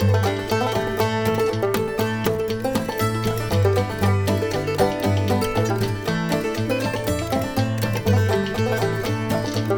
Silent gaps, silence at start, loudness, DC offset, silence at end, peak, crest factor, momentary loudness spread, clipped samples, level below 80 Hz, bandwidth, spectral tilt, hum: none; 0 s; -22 LUFS; under 0.1%; 0 s; -6 dBFS; 16 dB; 4 LU; under 0.1%; -42 dBFS; 20 kHz; -6 dB/octave; none